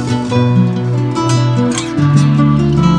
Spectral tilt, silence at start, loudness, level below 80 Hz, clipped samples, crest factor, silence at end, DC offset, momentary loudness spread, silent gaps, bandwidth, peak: -7 dB/octave; 0 s; -12 LUFS; -34 dBFS; under 0.1%; 12 dB; 0 s; under 0.1%; 5 LU; none; 10.5 kHz; 0 dBFS